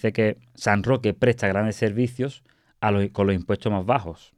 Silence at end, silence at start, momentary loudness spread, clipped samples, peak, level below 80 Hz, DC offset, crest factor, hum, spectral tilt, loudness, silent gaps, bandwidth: 0.25 s; 0.05 s; 5 LU; under 0.1%; -4 dBFS; -52 dBFS; under 0.1%; 18 dB; none; -7 dB/octave; -24 LUFS; none; 12 kHz